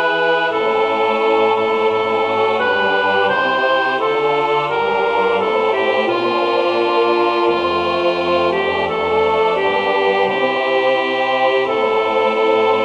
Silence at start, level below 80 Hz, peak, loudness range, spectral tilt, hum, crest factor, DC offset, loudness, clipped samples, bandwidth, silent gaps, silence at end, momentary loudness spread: 0 s; -58 dBFS; -2 dBFS; 1 LU; -5 dB/octave; none; 14 dB; under 0.1%; -16 LUFS; under 0.1%; 8.6 kHz; none; 0 s; 2 LU